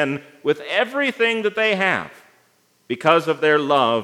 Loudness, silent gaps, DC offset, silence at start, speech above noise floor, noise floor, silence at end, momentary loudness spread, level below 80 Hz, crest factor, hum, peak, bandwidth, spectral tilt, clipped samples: -19 LUFS; none; under 0.1%; 0 s; 41 dB; -60 dBFS; 0 s; 8 LU; -76 dBFS; 18 dB; none; -2 dBFS; 14 kHz; -5 dB/octave; under 0.1%